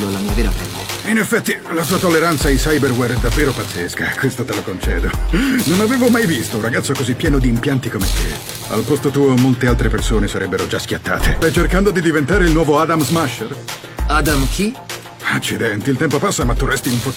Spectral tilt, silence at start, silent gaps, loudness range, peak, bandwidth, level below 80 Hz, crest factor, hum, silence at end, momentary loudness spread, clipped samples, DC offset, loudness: -5 dB/octave; 0 s; none; 2 LU; 0 dBFS; 17 kHz; -24 dBFS; 16 dB; none; 0 s; 8 LU; under 0.1%; under 0.1%; -17 LUFS